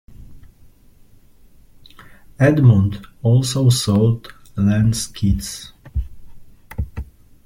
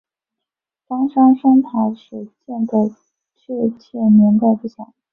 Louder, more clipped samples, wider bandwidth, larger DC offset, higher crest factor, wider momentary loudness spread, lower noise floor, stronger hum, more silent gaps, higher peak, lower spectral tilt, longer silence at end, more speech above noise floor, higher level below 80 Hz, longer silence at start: about the same, -18 LUFS vs -16 LUFS; neither; first, 16 kHz vs 4 kHz; neither; about the same, 16 dB vs 16 dB; about the same, 19 LU vs 19 LU; second, -47 dBFS vs -84 dBFS; neither; neither; about the same, -2 dBFS vs -2 dBFS; second, -6 dB/octave vs -11.5 dB/octave; about the same, 0.4 s vs 0.3 s; second, 32 dB vs 69 dB; first, -36 dBFS vs -64 dBFS; second, 0.1 s vs 0.9 s